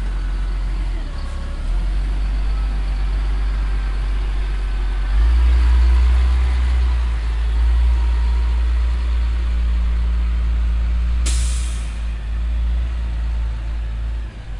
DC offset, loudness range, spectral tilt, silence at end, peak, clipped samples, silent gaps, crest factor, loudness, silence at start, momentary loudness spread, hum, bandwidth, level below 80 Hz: under 0.1%; 6 LU; -5.5 dB/octave; 0 s; -8 dBFS; under 0.1%; none; 10 dB; -21 LUFS; 0 s; 10 LU; none; 11 kHz; -18 dBFS